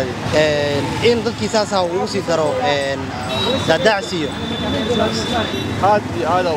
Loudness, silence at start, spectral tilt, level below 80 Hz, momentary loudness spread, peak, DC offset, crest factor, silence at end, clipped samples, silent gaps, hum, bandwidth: -18 LUFS; 0 s; -4.5 dB/octave; -42 dBFS; 6 LU; 0 dBFS; under 0.1%; 18 dB; 0 s; under 0.1%; none; none; 16 kHz